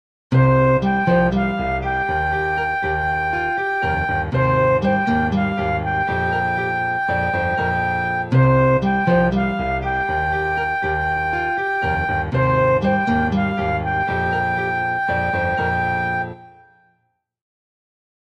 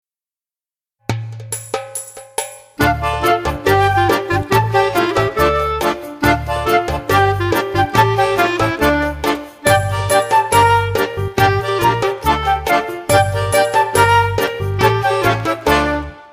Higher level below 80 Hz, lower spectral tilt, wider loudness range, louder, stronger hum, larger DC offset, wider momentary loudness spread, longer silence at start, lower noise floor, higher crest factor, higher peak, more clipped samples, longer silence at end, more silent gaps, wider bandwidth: about the same, -36 dBFS vs -34 dBFS; first, -8.5 dB/octave vs -5 dB/octave; about the same, 3 LU vs 3 LU; second, -19 LUFS vs -15 LUFS; neither; neither; second, 5 LU vs 11 LU; second, 0.3 s vs 1.1 s; second, -69 dBFS vs under -90 dBFS; about the same, 16 dB vs 16 dB; second, -4 dBFS vs 0 dBFS; neither; first, 1.85 s vs 0.05 s; neither; second, 7.4 kHz vs 15.5 kHz